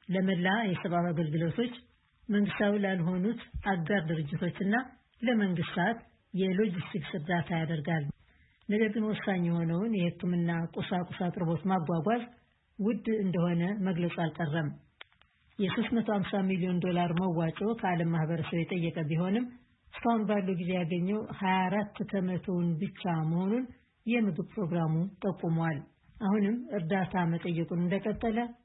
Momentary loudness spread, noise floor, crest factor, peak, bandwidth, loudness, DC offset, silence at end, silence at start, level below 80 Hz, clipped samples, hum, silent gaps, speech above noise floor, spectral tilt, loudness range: 6 LU; -67 dBFS; 16 dB; -16 dBFS; 4 kHz; -31 LUFS; under 0.1%; 0.1 s; 0.1 s; -60 dBFS; under 0.1%; none; none; 36 dB; -11 dB/octave; 2 LU